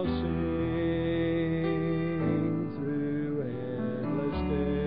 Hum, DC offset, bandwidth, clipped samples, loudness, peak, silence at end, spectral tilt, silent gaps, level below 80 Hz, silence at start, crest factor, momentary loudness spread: none; 0.4%; 5.2 kHz; under 0.1%; -30 LUFS; -16 dBFS; 0 s; -12 dB/octave; none; -44 dBFS; 0 s; 14 dB; 4 LU